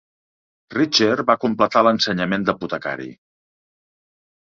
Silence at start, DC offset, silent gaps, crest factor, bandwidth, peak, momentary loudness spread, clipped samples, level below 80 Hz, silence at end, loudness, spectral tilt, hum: 0.7 s; under 0.1%; none; 20 dB; 7.6 kHz; -2 dBFS; 12 LU; under 0.1%; -58 dBFS; 1.45 s; -19 LUFS; -4.5 dB/octave; none